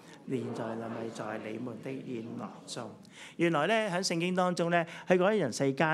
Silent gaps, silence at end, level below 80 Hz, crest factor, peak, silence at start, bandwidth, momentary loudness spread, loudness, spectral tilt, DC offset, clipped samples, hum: none; 0 s; -84 dBFS; 22 dB; -10 dBFS; 0 s; 13 kHz; 14 LU; -32 LUFS; -5 dB/octave; under 0.1%; under 0.1%; none